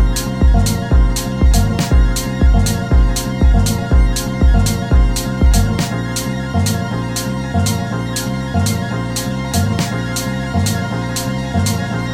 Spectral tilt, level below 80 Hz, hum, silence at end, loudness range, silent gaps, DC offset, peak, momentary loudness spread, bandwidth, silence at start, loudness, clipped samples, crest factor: -5 dB/octave; -18 dBFS; none; 0 s; 4 LU; none; under 0.1%; -2 dBFS; 6 LU; 16.5 kHz; 0 s; -16 LUFS; under 0.1%; 12 dB